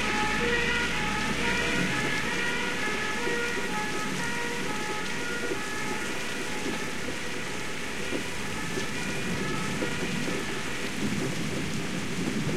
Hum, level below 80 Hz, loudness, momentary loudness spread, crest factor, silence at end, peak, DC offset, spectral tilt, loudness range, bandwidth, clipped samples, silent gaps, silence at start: none; -48 dBFS; -29 LUFS; 6 LU; 16 dB; 0 s; -14 dBFS; 2%; -3.5 dB/octave; 5 LU; 16 kHz; under 0.1%; none; 0 s